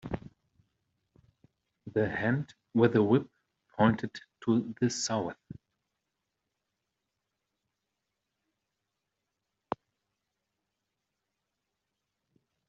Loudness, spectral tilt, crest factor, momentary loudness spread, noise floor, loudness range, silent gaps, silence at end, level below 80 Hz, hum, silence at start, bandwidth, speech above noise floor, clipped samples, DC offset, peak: -30 LUFS; -6 dB/octave; 24 dB; 18 LU; -85 dBFS; 20 LU; none; 7.35 s; -64 dBFS; none; 0.05 s; 7.6 kHz; 57 dB; under 0.1%; under 0.1%; -10 dBFS